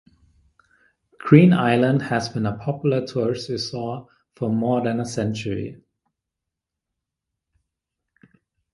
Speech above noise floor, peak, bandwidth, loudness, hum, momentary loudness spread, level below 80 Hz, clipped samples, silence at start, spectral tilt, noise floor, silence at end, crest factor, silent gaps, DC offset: 64 dB; 0 dBFS; 11.5 kHz; -21 LUFS; none; 16 LU; -56 dBFS; under 0.1%; 1.25 s; -7 dB/octave; -84 dBFS; 3 s; 24 dB; none; under 0.1%